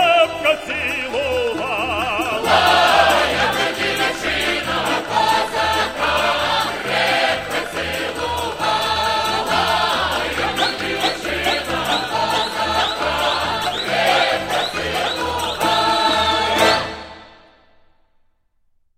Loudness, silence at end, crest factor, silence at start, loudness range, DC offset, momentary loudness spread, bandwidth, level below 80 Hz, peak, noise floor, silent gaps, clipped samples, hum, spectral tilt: -18 LUFS; 1.7 s; 18 dB; 0 s; 3 LU; under 0.1%; 6 LU; 16 kHz; -42 dBFS; 0 dBFS; -61 dBFS; none; under 0.1%; none; -2.5 dB/octave